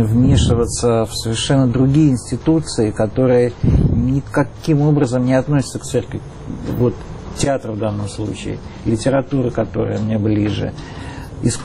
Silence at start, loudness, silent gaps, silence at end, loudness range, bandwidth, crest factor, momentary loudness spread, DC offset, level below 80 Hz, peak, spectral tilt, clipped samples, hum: 0 s; -17 LUFS; none; 0 s; 5 LU; 12.5 kHz; 12 dB; 12 LU; under 0.1%; -30 dBFS; -4 dBFS; -6.5 dB/octave; under 0.1%; none